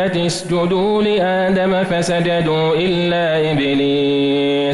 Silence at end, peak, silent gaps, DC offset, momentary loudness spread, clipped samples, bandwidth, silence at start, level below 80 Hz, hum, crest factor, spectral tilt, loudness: 0 s; -8 dBFS; none; under 0.1%; 2 LU; under 0.1%; 12 kHz; 0 s; -46 dBFS; none; 8 dB; -5.5 dB/octave; -16 LUFS